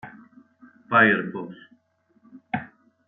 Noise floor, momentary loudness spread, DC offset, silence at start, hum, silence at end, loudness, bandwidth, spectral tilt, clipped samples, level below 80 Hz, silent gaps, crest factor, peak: -65 dBFS; 22 LU; under 0.1%; 0.05 s; none; 0.4 s; -22 LUFS; 4.1 kHz; -9 dB/octave; under 0.1%; -70 dBFS; none; 22 dB; -4 dBFS